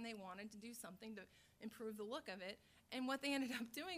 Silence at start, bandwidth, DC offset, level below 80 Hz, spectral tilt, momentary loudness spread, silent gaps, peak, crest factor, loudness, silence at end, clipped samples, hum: 0 s; 15.5 kHz; under 0.1%; -82 dBFS; -3.5 dB/octave; 14 LU; none; -30 dBFS; 18 dB; -49 LUFS; 0 s; under 0.1%; none